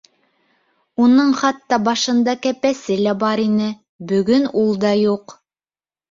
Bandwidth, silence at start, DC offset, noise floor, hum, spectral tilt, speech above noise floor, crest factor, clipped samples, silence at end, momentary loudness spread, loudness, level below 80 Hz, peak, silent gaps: 7.6 kHz; 1 s; under 0.1%; under -90 dBFS; none; -5 dB/octave; over 73 dB; 16 dB; under 0.1%; 0.8 s; 7 LU; -17 LUFS; -60 dBFS; -2 dBFS; 3.89-3.99 s